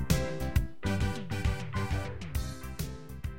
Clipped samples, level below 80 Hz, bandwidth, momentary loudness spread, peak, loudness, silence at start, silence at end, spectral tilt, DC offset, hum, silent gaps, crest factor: under 0.1%; -38 dBFS; 16.5 kHz; 9 LU; -12 dBFS; -34 LUFS; 0 s; 0 s; -5.5 dB/octave; 0.8%; none; none; 20 dB